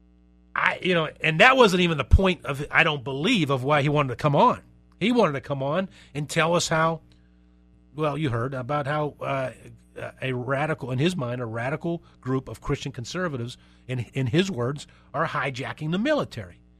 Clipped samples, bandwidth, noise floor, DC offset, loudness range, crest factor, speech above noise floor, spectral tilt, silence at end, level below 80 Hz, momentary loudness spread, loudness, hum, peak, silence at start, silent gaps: under 0.1%; 14 kHz; -56 dBFS; under 0.1%; 9 LU; 24 dB; 32 dB; -5.5 dB/octave; 0.25 s; -38 dBFS; 13 LU; -24 LUFS; none; -2 dBFS; 0.55 s; none